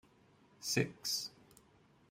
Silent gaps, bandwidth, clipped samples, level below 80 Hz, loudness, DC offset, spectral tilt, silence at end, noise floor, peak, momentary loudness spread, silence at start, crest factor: none; 16 kHz; under 0.1%; -74 dBFS; -38 LUFS; under 0.1%; -3 dB/octave; 0.8 s; -67 dBFS; -18 dBFS; 10 LU; 0.6 s; 24 dB